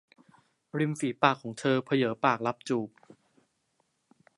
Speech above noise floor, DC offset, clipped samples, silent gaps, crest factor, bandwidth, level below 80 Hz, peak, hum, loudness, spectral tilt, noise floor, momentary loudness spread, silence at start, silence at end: 47 dB; under 0.1%; under 0.1%; none; 26 dB; 11.5 kHz; -76 dBFS; -6 dBFS; none; -29 LUFS; -5.5 dB/octave; -75 dBFS; 7 LU; 0.75 s; 1.5 s